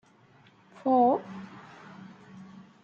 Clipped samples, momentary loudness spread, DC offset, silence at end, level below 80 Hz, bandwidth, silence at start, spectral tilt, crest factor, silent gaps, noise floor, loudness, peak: under 0.1%; 26 LU; under 0.1%; 0.4 s; -80 dBFS; 7.2 kHz; 0.85 s; -8 dB/octave; 20 dB; none; -59 dBFS; -26 LUFS; -12 dBFS